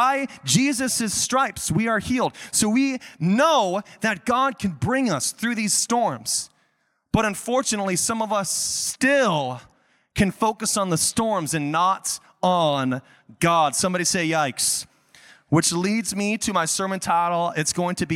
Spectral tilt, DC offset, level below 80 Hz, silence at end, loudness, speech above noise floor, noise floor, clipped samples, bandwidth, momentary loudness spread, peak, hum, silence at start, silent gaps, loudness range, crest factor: -3.5 dB/octave; under 0.1%; -52 dBFS; 0 s; -22 LUFS; 47 dB; -69 dBFS; under 0.1%; 17 kHz; 6 LU; -4 dBFS; none; 0 s; none; 2 LU; 20 dB